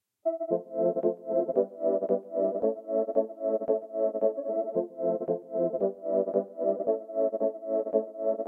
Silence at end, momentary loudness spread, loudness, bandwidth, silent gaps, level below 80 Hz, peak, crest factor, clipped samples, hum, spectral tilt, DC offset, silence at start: 0 s; 4 LU; -29 LUFS; 2.1 kHz; none; -82 dBFS; -12 dBFS; 16 dB; under 0.1%; none; -12 dB/octave; under 0.1%; 0.25 s